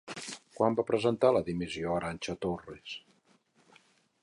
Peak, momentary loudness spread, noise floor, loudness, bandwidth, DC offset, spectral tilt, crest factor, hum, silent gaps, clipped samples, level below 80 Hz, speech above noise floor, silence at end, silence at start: -12 dBFS; 16 LU; -68 dBFS; -31 LUFS; 11.5 kHz; under 0.1%; -5.5 dB/octave; 22 dB; none; none; under 0.1%; -60 dBFS; 37 dB; 1.25 s; 0.05 s